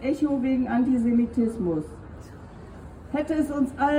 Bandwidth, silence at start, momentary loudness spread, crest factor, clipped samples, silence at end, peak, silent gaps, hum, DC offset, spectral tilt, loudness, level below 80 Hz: 11 kHz; 0 s; 21 LU; 14 dB; under 0.1%; 0 s; -12 dBFS; none; none; under 0.1%; -7.5 dB/octave; -25 LUFS; -48 dBFS